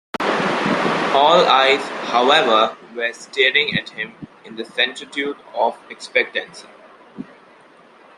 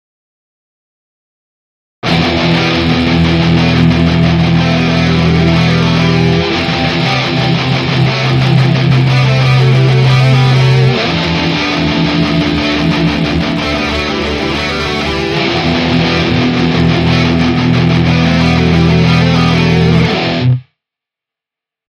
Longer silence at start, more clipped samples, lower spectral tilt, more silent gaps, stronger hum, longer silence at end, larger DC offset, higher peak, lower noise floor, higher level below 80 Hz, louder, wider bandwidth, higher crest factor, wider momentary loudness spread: second, 0.2 s vs 2.05 s; neither; second, -3.5 dB/octave vs -6.5 dB/octave; neither; neither; second, 0.95 s vs 1.25 s; neither; about the same, -2 dBFS vs 0 dBFS; second, -48 dBFS vs -85 dBFS; second, -64 dBFS vs -28 dBFS; second, -17 LUFS vs -11 LUFS; first, 12 kHz vs 8.4 kHz; first, 18 dB vs 10 dB; first, 20 LU vs 5 LU